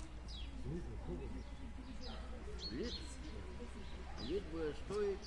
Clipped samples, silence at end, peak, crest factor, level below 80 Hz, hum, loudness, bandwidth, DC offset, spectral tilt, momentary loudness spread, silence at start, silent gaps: under 0.1%; 0 s; -30 dBFS; 14 dB; -50 dBFS; none; -47 LUFS; 11.5 kHz; under 0.1%; -5.5 dB/octave; 9 LU; 0 s; none